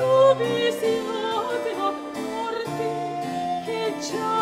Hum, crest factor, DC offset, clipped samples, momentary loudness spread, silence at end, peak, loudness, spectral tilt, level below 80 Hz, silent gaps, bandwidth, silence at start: none; 16 dB; under 0.1%; under 0.1%; 10 LU; 0 s; -8 dBFS; -25 LUFS; -4.5 dB/octave; -64 dBFS; none; 16 kHz; 0 s